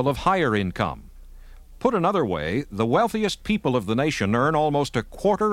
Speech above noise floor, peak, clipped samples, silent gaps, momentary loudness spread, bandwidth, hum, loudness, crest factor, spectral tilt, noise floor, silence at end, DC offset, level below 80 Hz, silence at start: 21 dB; -4 dBFS; under 0.1%; none; 6 LU; 16 kHz; none; -23 LUFS; 18 dB; -6 dB/octave; -43 dBFS; 0 s; under 0.1%; -44 dBFS; 0 s